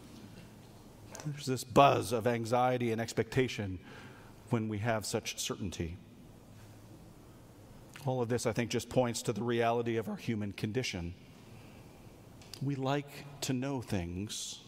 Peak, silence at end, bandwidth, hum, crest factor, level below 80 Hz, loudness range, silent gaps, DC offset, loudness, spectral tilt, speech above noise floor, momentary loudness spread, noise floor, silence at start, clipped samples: -8 dBFS; 0 s; 16 kHz; none; 26 dB; -60 dBFS; 8 LU; none; under 0.1%; -34 LUFS; -5 dB/octave; 22 dB; 24 LU; -55 dBFS; 0 s; under 0.1%